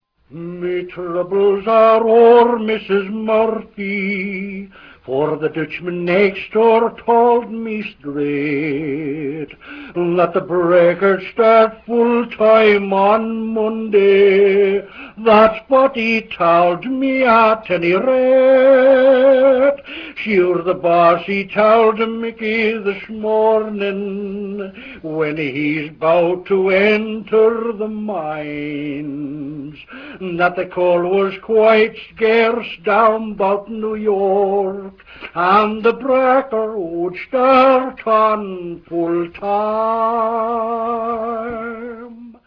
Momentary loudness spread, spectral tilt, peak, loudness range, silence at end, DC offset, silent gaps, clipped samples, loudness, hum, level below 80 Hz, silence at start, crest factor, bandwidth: 15 LU; -8 dB/octave; 0 dBFS; 7 LU; 0.15 s; under 0.1%; none; under 0.1%; -15 LUFS; none; -52 dBFS; 0.35 s; 16 dB; 5.4 kHz